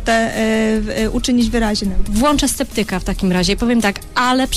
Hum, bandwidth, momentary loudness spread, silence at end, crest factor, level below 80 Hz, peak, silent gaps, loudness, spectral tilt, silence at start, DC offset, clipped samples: none; 15.5 kHz; 4 LU; 0 s; 14 dB; -26 dBFS; -2 dBFS; none; -17 LUFS; -4 dB/octave; 0 s; under 0.1%; under 0.1%